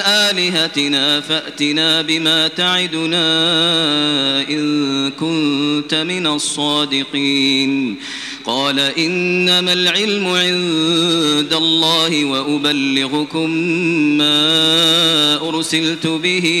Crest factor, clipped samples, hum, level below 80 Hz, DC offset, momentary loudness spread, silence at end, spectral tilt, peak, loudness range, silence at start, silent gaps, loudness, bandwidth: 14 dB; under 0.1%; none; -60 dBFS; under 0.1%; 6 LU; 0 s; -3 dB/octave; -2 dBFS; 3 LU; 0 s; none; -14 LUFS; 16 kHz